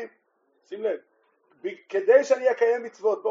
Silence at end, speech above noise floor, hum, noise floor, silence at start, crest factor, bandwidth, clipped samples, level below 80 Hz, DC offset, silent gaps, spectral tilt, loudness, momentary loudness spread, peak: 0 s; 46 dB; none; -69 dBFS; 0 s; 20 dB; 7.6 kHz; under 0.1%; under -90 dBFS; under 0.1%; none; -2 dB/octave; -23 LUFS; 17 LU; -6 dBFS